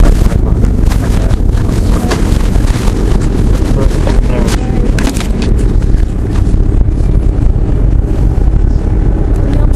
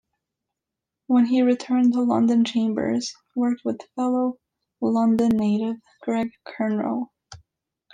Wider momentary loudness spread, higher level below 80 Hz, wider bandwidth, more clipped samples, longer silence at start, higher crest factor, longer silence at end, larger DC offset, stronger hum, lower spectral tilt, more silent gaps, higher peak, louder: second, 1 LU vs 10 LU; first, -10 dBFS vs -64 dBFS; first, 12.5 kHz vs 9.2 kHz; first, 0.7% vs under 0.1%; second, 0 s vs 1.1 s; second, 8 dB vs 14 dB; second, 0 s vs 0.6 s; neither; neither; about the same, -7 dB/octave vs -6 dB/octave; neither; first, 0 dBFS vs -10 dBFS; first, -12 LUFS vs -23 LUFS